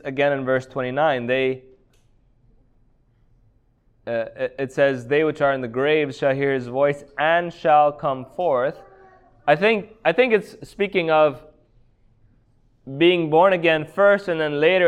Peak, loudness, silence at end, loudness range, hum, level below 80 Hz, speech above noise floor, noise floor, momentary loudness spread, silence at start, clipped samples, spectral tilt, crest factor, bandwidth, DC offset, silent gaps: -4 dBFS; -20 LUFS; 0 s; 7 LU; none; -58 dBFS; 41 dB; -60 dBFS; 10 LU; 0.05 s; under 0.1%; -6.5 dB/octave; 18 dB; 10 kHz; under 0.1%; none